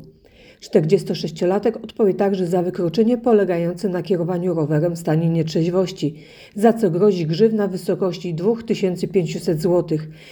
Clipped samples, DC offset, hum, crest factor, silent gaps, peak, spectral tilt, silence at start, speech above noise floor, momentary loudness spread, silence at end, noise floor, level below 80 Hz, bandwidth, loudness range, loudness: under 0.1%; under 0.1%; none; 18 dB; none; -2 dBFS; -7.5 dB/octave; 0 s; 29 dB; 6 LU; 0 s; -48 dBFS; -56 dBFS; 19.5 kHz; 1 LU; -20 LUFS